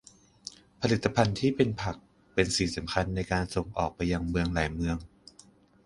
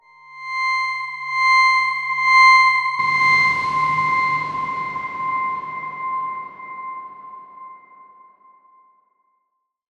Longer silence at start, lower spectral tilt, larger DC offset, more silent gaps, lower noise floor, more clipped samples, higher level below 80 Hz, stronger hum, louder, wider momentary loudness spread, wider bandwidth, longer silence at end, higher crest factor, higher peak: first, 0.8 s vs 0.3 s; first, -5.5 dB/octave vs -1.5 dB/octave; neither; neither; second, -58 dBFS vs -74 dBFS; neither; first, -44 dBFS vs -60 dBFS; neither; second, -29 LUFS vs -17 LUFS; second, 12 LU vs 20 LU; about the same, 11.5 kHz vs 11 kHz; second, 0.8 s vs 2.25 s; about the same, 22 dB vs 18 dB; second, -8 dBFS vs -2 dBFS